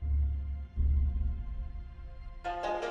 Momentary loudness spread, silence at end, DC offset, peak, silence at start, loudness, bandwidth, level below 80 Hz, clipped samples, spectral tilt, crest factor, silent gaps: 16 LU; 0 s; under 0.1%; -20 dBFS; 0 s; -35 LUFS; 6.4 kHz; -32 dBFS; under 0.1%; -7.5 dB/octave; 12 dB; none